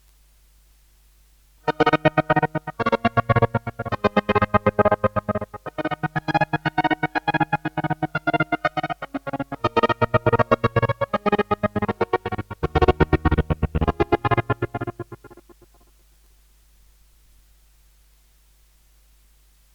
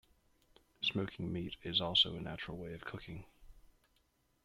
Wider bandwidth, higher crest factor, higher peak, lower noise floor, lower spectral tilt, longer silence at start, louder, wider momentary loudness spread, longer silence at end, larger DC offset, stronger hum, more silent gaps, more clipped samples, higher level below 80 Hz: first, 18.5 kHz vs 14 kHz; about the same, 22 dB vs 24 dB; first, -2 dBFS vs -18 dBFS; second, -56 dBFS vs -76 dBFS; first, -8 dB/octave vs -5 dB/octave; first, 1.65 s vs 0.8 s; first, -22 LUFS vs -36 LUFS; second, 10 LU vs 17 LU; first, 4.45 s vs 0.85 s; neither; neither; neither; neither; first, -38 dBFS vs -62 dBFS